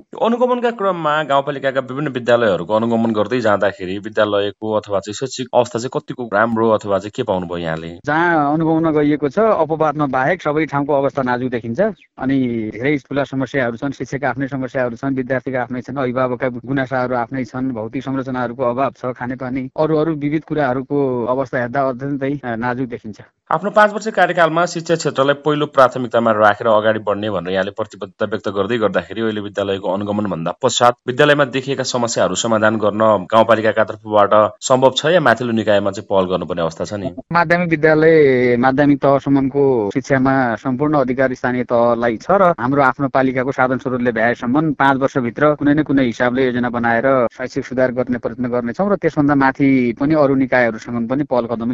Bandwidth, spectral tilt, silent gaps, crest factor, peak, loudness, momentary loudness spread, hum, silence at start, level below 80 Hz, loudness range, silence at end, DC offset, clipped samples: 8 kHz; -5.5 dB/octave; none; 16 dB; 0 dBFS; -17 LUFS; 9 LU; none; 0.15 s; -50 dBFS; 6 LU; 0 s; under 0.1%; under 0.1%